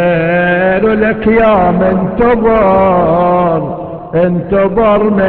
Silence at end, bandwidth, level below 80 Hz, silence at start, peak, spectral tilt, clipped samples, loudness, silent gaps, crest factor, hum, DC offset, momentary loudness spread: 0 s; 4.5 kHz; -32 dBFS; 0 s; 0 dBFS; -10.5 dB/octave; under 0.1%; -10 LUFS; none; 10 dB; none; 0.3%; 5 LU